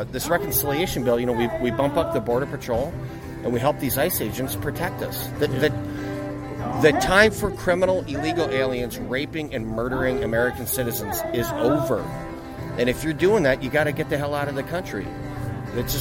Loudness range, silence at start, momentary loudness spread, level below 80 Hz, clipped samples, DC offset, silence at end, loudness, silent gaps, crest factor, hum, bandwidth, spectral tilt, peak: 4 LU; 0 s; 11 LU; -42 dBFS; under 0.1%; under 0.1%; 0 s; -23 LUFS; none; 20 dB; none; 16.5 kHz; -5 dB/octave; -2 dBFS